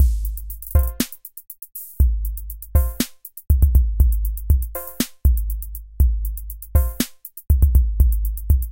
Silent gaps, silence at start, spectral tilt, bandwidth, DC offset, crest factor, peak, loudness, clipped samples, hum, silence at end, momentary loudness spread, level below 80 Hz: none; 0 s; -6 dB/octave; 17.5 kHz; 0.4%; 16 dB; -4 dBFS; -22 LUFS; under 0.1%; none; 0 s; 15 LU; -20 dBFS